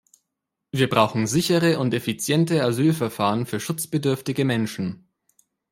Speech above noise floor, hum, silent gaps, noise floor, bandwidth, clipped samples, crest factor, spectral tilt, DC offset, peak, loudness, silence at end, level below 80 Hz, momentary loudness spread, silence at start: 60 dB; none; none; -82 dBFS; 16.5 kHz; under 0.1%; 20 dB; -5.5 dB/octave; under 0.1%; -2 dBFS; -22 LUFS; 0.75 s; -60 dBFS; 8 LU; 0.75 s